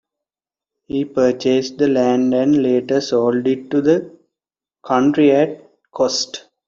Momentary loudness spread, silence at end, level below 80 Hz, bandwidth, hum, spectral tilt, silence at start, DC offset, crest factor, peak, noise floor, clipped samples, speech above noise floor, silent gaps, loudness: 8 LU; 0.3 s; -58 dBFS; 7.6 kHz; none; -5 dB/octave; 0.95 s; under 0.1%; 16 dB; -2 dBFS; -90 dBFS; under 0.1%; 74 dB; none; -17 LUFS